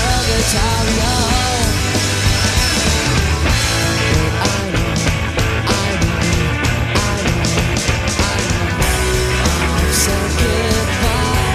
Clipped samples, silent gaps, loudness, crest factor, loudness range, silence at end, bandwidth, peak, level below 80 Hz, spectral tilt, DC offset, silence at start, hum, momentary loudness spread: under 0.1%; none; -15 LUFS; 14 dB; 2 LU; 0 s; 15 kHz; -2 dBFS; -22 dBFS; -4 dB/octave; under 0.1%; 0 s; none; 3 LU